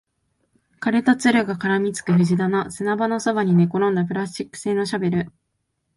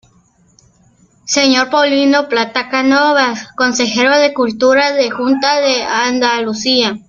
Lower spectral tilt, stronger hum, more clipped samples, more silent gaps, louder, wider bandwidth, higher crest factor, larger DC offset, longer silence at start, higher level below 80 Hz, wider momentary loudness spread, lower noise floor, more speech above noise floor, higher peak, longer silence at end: first, -6.5 dB/octave vs -2 dB/octave; neither; neither; neither; second, -21 LUFS vs -12 LUFS; first, 11.5 kHz vs 7.4 kHz; about the same, 16 dB vs 14 dB; neither; second, 0.8 s vs 1.25 s; about the same, -60 dBFS vs -56 dBFS; first, 9 LU vs 5 LU; first, -74 dBFS vs -52 dBFS; first, 54 dB vs 39 dB; second, -4 dBFS vs 0 dBFS; first, 0.7 s vs 0.1 s